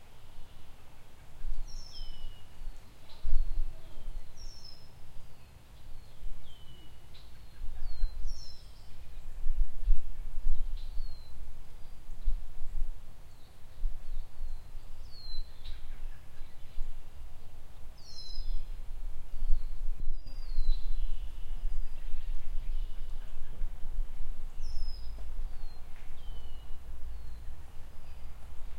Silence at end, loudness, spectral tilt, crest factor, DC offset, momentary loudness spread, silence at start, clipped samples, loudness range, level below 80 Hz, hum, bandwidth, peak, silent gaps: 0 s; -45 LUFS; -5 dB/octave; 18 dB; under 0.1%; 16 LU; 0 s; under 0.1%; 8 LU; -34 dBFS; none; 5.8 kHz; -10 dBFS; none